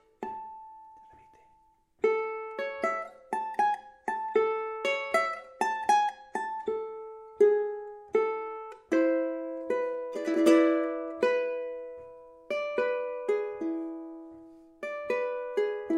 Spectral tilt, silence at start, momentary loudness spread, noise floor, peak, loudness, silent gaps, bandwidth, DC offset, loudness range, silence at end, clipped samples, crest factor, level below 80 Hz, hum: -4 dB/octave; 0.2 s; 16 LU; -65 dBFS; -10 dBFS; -30 LUFS; none; 13 kHz; under 0.1%; 6 LU; 0 s; under 0.1%; 20 dB; -74 dBFS; none